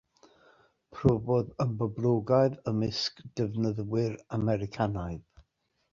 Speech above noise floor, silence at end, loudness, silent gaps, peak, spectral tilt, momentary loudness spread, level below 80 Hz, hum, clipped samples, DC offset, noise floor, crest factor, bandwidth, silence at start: 47 dB; 0.75 s; -30 LUFS; none; -10 dBFS; -7.5 dB/octave; 8 LU; -54 dBFS; none; under 0.1%; under 0.1%; -76 dBFS; 20 dB; 7.4 kHz; 0.9 s